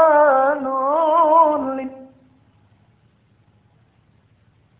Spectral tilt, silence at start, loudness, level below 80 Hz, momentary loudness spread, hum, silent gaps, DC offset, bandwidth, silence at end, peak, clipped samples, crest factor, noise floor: -8.5 dB/octave; 0 s; -16 LUFS; -64 dBFS; 14 LU; none; none; under 0.1%; 3.8 kHz; 2.75 s; -4 dBFS; under 0.1%; 16 dB; -58 dBFS